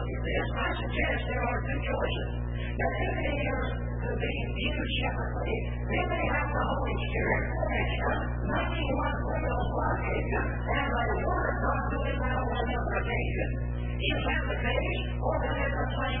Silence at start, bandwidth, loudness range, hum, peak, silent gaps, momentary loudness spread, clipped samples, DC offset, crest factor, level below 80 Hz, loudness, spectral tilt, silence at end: 0 s; 4 kHz; 2 LU; 60 Hz at -30 dBFS; -14 dBFS; none; 3 LU; under 0.1%; 0.3%; 16 dB; -34 dBFS; -30 LUFS; -10.5 dB/octave; 0 s